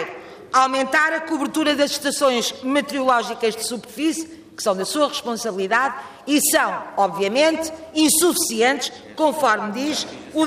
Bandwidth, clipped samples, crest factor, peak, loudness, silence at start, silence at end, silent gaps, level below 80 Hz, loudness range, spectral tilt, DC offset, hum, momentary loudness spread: 15.5 kHz; under 0.1%; 16 dB; -4 dBFS; -20 LUFS; 0 s; 0 s; none; -64 dBFS; 3 LU; -2 dB/octave; under 0.1%; none; 9 LU